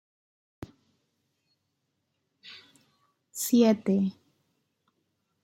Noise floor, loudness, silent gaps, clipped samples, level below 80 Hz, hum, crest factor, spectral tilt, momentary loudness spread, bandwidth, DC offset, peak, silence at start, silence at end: -79 dBFS; -25 LUFS; none; under 0.1%; -70 dBFS; none; 22 dB; -5.5 dB/octave; 26 LU; 16 kHz; under 0.1%; -10 dBFS; 2.45 s; 1.3 s